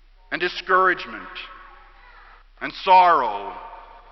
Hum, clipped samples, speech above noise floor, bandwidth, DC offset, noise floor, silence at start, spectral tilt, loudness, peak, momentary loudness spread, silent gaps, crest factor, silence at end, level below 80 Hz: none; under 0.1%; 28 dB; 6 kHz; under 0.1%; -48 dBFS; 0.3 s; -4.5 dB/octave; -19 LUFS; -4 dBFS; 22 LU; none; 20 dB; 0.35 s; -52 dBFS